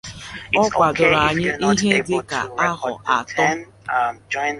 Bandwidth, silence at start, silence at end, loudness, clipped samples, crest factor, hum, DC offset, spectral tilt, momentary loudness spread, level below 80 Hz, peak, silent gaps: 11.5 kHz; 0.05 s; 0 s; -19 LUFS; under 0.1%; 18 dB; none; under 0.1%; -4 dB/octave; 10 LU; -48 dBFS; -2 dBFS; none